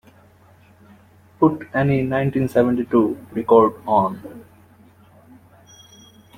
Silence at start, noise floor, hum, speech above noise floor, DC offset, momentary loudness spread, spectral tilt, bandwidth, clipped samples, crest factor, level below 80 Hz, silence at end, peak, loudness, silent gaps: 1.4 s; -51 dBFS; none; 33 dB; under 0.1%; 10 LU; -8.5 dB/octave; 16 kHz; under 0.1%; 20 dB; -54 dBFS; 1.95 s; -2 dBFS; -19 LUFS; none